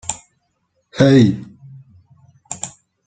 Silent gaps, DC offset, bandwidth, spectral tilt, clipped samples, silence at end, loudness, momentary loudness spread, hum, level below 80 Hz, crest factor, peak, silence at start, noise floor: none; under 0.1%; 9.4 kHz; -6 dB/octave; under 0.1%; 0.4 s; -15 LUFS; 23 LU; none; -54 dBFS; 18 dB; -2 dBFS; 0.1 s; -68 dBFS